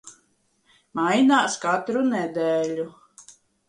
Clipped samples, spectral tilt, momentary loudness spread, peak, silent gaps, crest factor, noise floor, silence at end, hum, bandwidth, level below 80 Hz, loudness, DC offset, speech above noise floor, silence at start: under 0.1%; -4 dB/octave; 13 LU; -8 dBFS; none; 18 dB; -66 dBFS; 0.35 s; none; 11.5 kHz; -70 dBFS; -22 LUFS; under 0.1%; 45 dB; 0.05 s